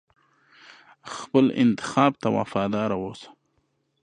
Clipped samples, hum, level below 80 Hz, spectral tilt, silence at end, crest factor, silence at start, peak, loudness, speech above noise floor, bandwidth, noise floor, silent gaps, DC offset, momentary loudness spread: under 0.1%; none; -62 dBFS; -6.5 dB/octave; 0.75 s; 22 dB; 1.05 s; -4 dBFS; -23 LUFS; 48 dB; 10 kHz; -71 dBFS; none; under 0.1%; 17 LU